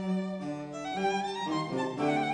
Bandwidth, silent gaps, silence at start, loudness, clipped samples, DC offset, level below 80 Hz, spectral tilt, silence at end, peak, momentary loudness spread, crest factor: 10 kHz; none; 0 s; -32 LUFS; under 0.1%; under 0.1%; -68 dBFS; -5.5 dB/octave; 0 s; -16 dBFS; 7 LU; 16 dB